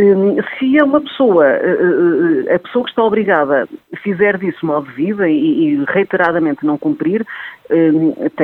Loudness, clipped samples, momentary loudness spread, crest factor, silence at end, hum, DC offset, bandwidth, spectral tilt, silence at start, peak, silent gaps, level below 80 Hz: -14 LUFS; under 0.1%; 8 LU; 14 dB; 0 s; none; under 0.1%; 4.2 kHz; -9 dB/octave; 0 s; 0 dBFS; none; -60 dBFS